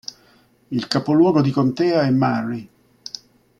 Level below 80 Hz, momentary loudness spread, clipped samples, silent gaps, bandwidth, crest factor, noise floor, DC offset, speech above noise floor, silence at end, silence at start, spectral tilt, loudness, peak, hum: -60 dBFS; 19 LU; under 0.1%; none; 11 kHz; 18 dB; -55 dBFS; under 0.1%; 38 dB; 0.95 s; 0.7 s; -7 dB/octave; -19 LUFS; -2 dBFS; none